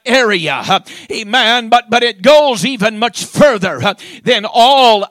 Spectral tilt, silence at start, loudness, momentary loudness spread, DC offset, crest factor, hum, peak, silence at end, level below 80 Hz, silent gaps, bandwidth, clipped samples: -3.5 dB/octave; 0.05 s; -11 LUFS; 9 LU; under 0.1%; 12 dB; none; 0 dBFS; 0.05 s; -50 dBFS; none; 16.5 kHz; 1%